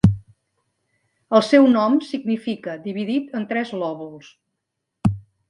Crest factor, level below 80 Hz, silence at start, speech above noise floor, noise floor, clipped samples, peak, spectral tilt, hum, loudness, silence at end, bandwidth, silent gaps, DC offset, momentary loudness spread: 20 dB; -44 dBFS; 0.05 s; 59 dB; -79 dBFS; under 0.1%; -2 dBFS; -7.5 dB/octave; none; -20 LUFS; 0.3 s; 11 kHz; none; under 0.1%; 15 LU